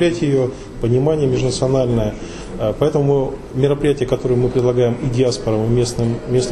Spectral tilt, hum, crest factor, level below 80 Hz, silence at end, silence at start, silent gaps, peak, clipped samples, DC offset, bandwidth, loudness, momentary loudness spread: -6.5 dB/octave; none; 16 dB; -34 dBFS; 0 s; 0 s; none; -2 dBFS; under 0.1%; under 0.1%; 12 kHz; -18 LUFS; 7 LU